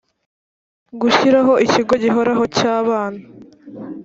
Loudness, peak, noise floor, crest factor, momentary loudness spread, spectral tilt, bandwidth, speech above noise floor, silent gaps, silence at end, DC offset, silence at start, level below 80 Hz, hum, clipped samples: -15 LUFS; -2 dBFS; under -90 dBFS; 16 dB; 16 LU; -4.5 dB/octave; 7.8 kHz; over 75 dB; none; 0 s; under 0.1%; 0.95 s; -56 dBFS; none; under 0.1%